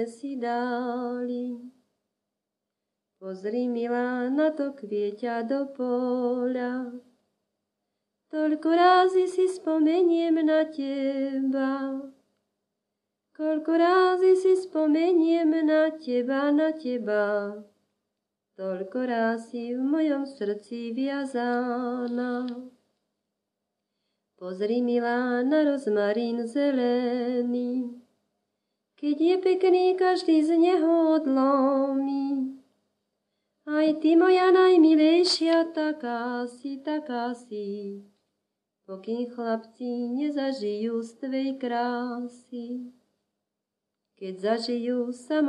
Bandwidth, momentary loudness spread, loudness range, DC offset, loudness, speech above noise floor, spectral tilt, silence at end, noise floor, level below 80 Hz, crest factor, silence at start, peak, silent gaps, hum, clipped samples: 10.5 kHz; 14 LU; 11 LU; under 0.1%; -25 LUFS; 61 dB; -5 dB/octave; 0 s; -85 dBFS; -86 dBFS; 18 dB; 0 s; -8 dBFS; none; none; under 0.1%